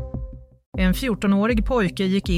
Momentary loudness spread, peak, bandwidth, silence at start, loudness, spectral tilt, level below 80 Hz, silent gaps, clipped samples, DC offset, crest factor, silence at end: 15 LU; -8 dBFS; 15.5 kHz; 0 s; -21 LUFS; -6.5 dB/octave; -30 dBFS; 0.66-0.72 s; under 0.1%; under 0.1%; 14 dB; 0 s